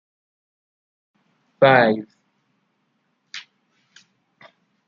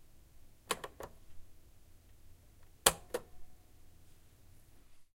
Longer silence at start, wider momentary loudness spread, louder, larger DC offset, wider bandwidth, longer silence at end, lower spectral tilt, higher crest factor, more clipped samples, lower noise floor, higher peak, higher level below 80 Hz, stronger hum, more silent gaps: first, 1.6 s vs 0 s; first, 24 LU vs 21 LU; first, -17 LUFS vs -35 LUFS; neither; second, 7.2 kHz vs 16 kHz; first, 1.45 s vs 0.1 s; first, -6.5 dB/octave vs -1 dB/octave; second, 24 dB vs 38 dB; neither; first, -70 dBFS vs -59 dBFS; first, -2 dBFS vs -6 dBFS; second, -72 dBFS vs -60 dBFS; neither; neither